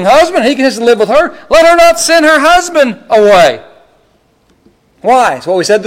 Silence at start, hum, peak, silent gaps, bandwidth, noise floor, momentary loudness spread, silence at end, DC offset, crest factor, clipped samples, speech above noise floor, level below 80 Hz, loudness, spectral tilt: 0 s; none; 0 dBFS; none; 16.5 kHz; -51 dBFS; 6 LU; 0 s; under 0.1%; 8 dB; under 0.1%; 44 dB; -38 dBFS; -7 LUFS; -3 dB/octave